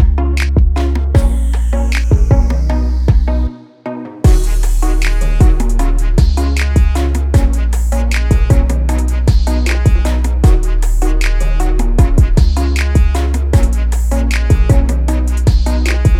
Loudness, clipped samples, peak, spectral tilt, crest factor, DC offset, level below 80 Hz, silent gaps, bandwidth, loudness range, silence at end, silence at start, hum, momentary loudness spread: -14 LUFS; under 0.1%; 0 dBFS; -6.5 dB/octave; 10 dB; under 0.1%; -12 dBFS; none; 14 kHz; 1 LU; 0 s; 0 s; none; 4 LU